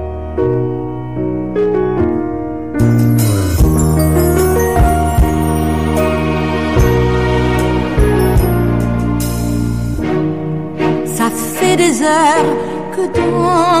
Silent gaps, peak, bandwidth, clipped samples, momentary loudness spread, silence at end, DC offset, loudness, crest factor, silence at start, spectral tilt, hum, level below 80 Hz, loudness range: none; -2 dBFS; 15.5 kHz; under 0.1%; 8 LU; 0 s; 2%; -14 LUFS; 10 dB; 0 s; -6 dB/octave; none; -22 dBFS; 3 LU